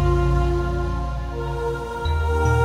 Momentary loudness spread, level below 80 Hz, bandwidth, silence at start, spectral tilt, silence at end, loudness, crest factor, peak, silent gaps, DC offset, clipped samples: 8 LU; -24 dBFS; 11 kHz; 0 s; -7.5 dB/octave; 0 s; -24 LUFS; 14 dB; -8 dBFS; none; under 0.1%; under 0.1%